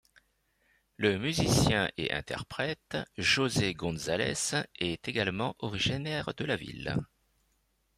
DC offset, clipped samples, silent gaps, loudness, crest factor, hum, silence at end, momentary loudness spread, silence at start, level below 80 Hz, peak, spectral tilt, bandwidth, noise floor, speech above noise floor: under 0.1%; under 0.1%; none; -31 LUFS; 20 dB; none; 0.95 s; 9 LU; 1 s; -54 dBFS; -12 dBFS; -4 dB/octave; 15.5 kHz; -74 dBFS; 43 dB